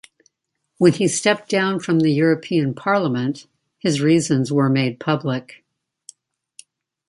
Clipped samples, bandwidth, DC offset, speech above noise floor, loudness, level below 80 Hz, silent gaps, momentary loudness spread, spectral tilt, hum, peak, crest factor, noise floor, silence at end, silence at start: under 0.1%; 11.5 kHz; under 0.1%; 57 dB; -19 LUFS; -64 dBFS; none; 8 LU; -5.5 dB/octave; none; -2 dBFS; 18 dB; -75 dBFS; 1.65 s; 0.8 s